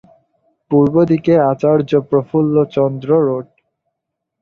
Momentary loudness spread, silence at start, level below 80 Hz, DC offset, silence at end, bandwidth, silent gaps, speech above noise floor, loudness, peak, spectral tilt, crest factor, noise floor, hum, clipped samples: 5 LU; 0.7 s; -54 dBFS; under 0.1%; 1 s; 6.8 kHz; none; 64 dB; -15 LUFS; -2 dBFS; -10 dB/octave; 14 dB; -77 dBFS; none; under 0.1%